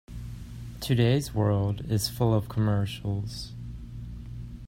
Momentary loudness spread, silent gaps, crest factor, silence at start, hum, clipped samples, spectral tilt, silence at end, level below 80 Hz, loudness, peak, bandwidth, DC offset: 16 LU; none; 18 dB; 0.1 s; none; under 0.1%; -6.5 dB/octave; 0 s; -44 dBFS; -27 LUFS; -10 dBFS; 16 kHz; under 0.1%